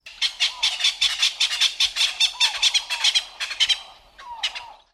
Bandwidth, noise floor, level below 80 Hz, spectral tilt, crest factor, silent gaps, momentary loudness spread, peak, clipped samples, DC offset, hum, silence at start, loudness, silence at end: 15.5 kHz; -44 dBFS; -60 dBFS; 4.5 dB/octave; 18 dB; none; 10 LU; -6 dBFS; under 0.1%; under 0.1%; none; 0.05 s; -20 LUFS; 0.2 s